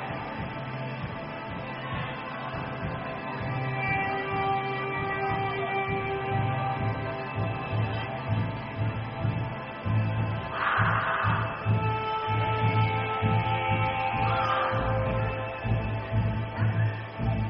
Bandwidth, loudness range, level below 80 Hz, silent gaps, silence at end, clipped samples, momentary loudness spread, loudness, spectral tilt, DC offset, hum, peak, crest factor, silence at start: 5.6 kHz; 5 LU; -46 dBFS; none; 0 s; under 0.1%; 9 LU; -29 LUFS; -5 dB/octave; under 0.1%; none; -12 dBFS; 16 dB; 0 s